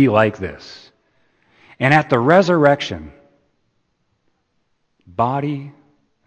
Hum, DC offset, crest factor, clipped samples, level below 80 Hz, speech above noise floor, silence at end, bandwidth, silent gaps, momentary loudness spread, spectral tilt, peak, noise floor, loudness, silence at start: none; under 0.1%; 20 dB; under 0.1%; -52 dBFS; 51 dB; 0.55 s; 8.8 kHz; none; 19 LU; -7 dB/octave; 0 dBFS; -68 dBFS; -17 LUFS; 0 s